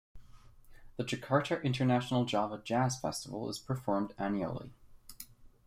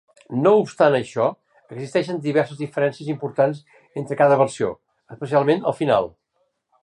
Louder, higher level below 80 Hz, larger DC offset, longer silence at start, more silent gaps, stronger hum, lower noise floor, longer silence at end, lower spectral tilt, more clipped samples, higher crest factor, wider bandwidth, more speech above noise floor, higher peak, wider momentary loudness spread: second, -34 LUFS vs -21 LUFS; about the same, -60 dBFS vs -64 dBFS; neither; second, 0.15 s vs 0.3 s; neither; neither; second, -55 dBFS vs -70 dBFS; second, 0.2 s vs 0.75 s; about the same, -5.5 dB/octave vs -6.5 dB/octave; neither; about the same, 20 dB vs 18 dB; first, 16 kHz vs 11 kHz; second, 22 dB vs 50 dB; second, -16 dBFS vs -2 dBFS; first, 19 LU vs 16 LU